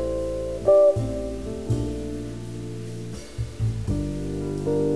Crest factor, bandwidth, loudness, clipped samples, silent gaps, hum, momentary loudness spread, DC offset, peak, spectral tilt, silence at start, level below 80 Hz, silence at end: 16 dB; 11 kHz; -26 LUFS; under 0.1%; none; none; 16 LU; 0.7%; -8 dBFS; -8 dB/octave; 0 s; -38 dBFS; 0 s